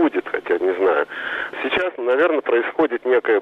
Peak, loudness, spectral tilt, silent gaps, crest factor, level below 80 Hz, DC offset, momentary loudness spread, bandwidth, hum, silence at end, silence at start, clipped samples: -8 dBFS; -20 LUFS; -5.5 dB/octave; none; 12 dB; -60 dBFS; under 0.1%; 7 LU; 5.6 kHz; none; 0 s; 0 s; under 0.1%